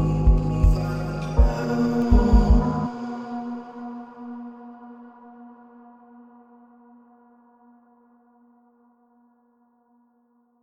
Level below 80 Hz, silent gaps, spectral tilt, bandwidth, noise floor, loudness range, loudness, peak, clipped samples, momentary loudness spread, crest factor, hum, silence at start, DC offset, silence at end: -26 dBFS; none; -8.5 dB/octave; 7.6 kHz; -64 dBFS; 22 LU; -23 LUFS; -4 dBFS; under 0.1%; 26 LU; 20 dB; none; 0 s; under 0.1%; 5.15 s